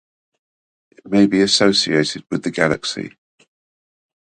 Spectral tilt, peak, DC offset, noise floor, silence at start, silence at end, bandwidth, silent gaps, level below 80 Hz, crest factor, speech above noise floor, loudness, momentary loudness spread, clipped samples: -4 dB/octave; 0 dBFS; under 0.1%; under -90 dBFS; 1.05 s; 1.15 s; 9.6 kHz; none; -56 dBFS; 20 dB; over 73 dB; -17 LUFS; 11 LU; under 0.1%